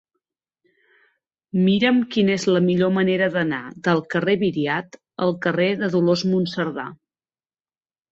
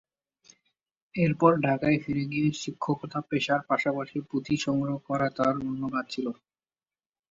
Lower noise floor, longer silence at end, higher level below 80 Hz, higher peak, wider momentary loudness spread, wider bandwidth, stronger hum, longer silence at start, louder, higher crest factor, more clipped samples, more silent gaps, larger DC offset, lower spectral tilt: about the same, under -90 dBFS vs under -90 dBFS; first, 1.2 s vs 0.95 s; about the same, -62 dBFS vs -62 dBFS; about the same, -4 dBFS vs -6 dBFS; about the same, 8 LU vs 10 LU; about the same, 7.8 kHz vs 7.8 kHz; neither; first, 1.55 s vs 1.15 s; first, -21 LUFS vs -28 LUFS; second, 18 dB vs 24 dB; neither; neither; neither; about the same, -6.5 dB/octave vs -6.5 dB/octave